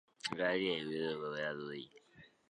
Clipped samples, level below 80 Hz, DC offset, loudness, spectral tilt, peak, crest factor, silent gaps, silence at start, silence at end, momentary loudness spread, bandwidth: under 0.1%; -76 dBFS; under 0.1%; -38 LUFS; -4.5 dB/octave; -20 dBFS; 20 dB; none; 0.25 s; 0.25 s; 13 LU; 11 kHz